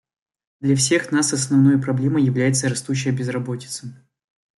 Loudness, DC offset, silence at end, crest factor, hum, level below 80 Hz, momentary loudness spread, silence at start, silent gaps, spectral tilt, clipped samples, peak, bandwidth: -20 LUFS; under 0.1%; 0.65 s; 14 dB; none; -60 dBFS; 12 LU; 0.6 s; none; -5 dB/octave; under 0.1%; -6 dBFS; 12 kHz